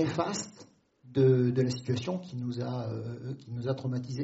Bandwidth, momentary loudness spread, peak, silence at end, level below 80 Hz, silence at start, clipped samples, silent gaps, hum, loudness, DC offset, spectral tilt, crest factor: 8 kHz; 14 LU; -14 dBFS; 0 s; -66 dBFS; 0 s; under 0.1%; none; none; -31 LUFS; under 0.1%; -7.5 dB/octave; 18 dB